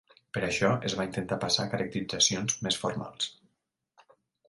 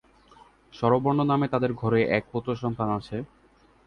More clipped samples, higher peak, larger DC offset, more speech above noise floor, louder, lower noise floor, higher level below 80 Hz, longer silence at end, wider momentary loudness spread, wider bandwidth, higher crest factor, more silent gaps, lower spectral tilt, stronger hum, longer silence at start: neither; second, -10 dBFS vs -6 dBFS; neither; first, 50 dB vs 34 dB; second, -29 LUFS vs -26 LUFS; first, -80 dBFS vs -59 dBFS; about the same, -60 dBFS vs -56 dBFS; first, 1.15 s vs 0.6 s; about the same, 10 LU vs 10 LU; first, 11.5 kHz vs 9.6 kHz; about the same, 22 dB vs 20 dB; neither; second, -3 dB/octave vs -9 dB/octave; neither; second, 0.35 s vs 0.75 s